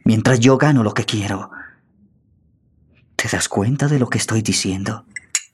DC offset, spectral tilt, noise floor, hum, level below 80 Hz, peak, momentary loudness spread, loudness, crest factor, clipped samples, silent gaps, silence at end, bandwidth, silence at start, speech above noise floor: under 0.1%; -5 dB/octave; -58 dBFS; none; -54 dBFS; -2 dBFS; 14 LU; -18 LUFS; 18 dB; under 0.1%; none; 0.1 s; 14 kHz; 0.05 s; 41 dB